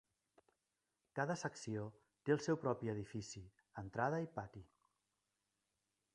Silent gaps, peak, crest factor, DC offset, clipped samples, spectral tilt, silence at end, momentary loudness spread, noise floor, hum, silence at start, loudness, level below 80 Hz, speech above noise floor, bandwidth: none; -22 dBFS; 22 dB; under 0.1%; under 0.1%; -6 dB/octave; 1.5 s; 15 LU; -89 dBFS; none; 1.15 s; -43 LUFS; -74 dBFS; 47 dB; 11 kHz